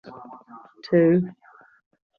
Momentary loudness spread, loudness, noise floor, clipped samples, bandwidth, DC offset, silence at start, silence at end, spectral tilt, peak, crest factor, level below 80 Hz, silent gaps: 25 LU; -21 LUFS; -46 dBFS; under 0.1%; 5.8 kHz; under 0.1%; 0.05 s; 0.85 s; -10 dB/octave; -6 dBFS; 18 dB; -68 dBFS; none